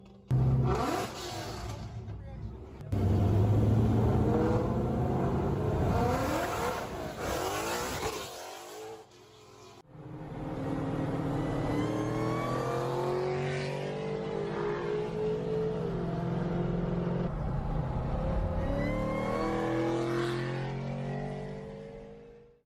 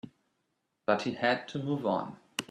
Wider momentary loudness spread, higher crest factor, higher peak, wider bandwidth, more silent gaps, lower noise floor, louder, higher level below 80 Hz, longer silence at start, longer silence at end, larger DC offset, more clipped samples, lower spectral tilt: first, 15 LU vs 9 LU; second, 14 dB vs 22 dB; second, -18 dBFS vs -12 dBFS; first, 16 kHz vs 14 kHz; neither; second, -55 dBFS vs -80 dBFS; about the same, -32 LUFS vs -32 LUFS; first, -44 dBFS vs -74 dBFS; about the same, 0 s vs 0.05 s; first, 0.25 s vs 0.05 s; neither; neither; first, -7 dB/octave vs -5 dB/octave